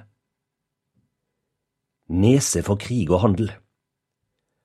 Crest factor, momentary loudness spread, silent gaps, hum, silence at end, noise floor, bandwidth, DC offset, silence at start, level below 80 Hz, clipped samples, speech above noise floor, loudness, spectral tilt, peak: 22 dB; 9 LU; none; none; 1.1 s; -81 dBFS; 14 kHz; under 0.1%; 2.1 s; -48 dBFS; under 0.1%; 62 dB; -21 LUFS; -6 dB/octave; -2 dBFS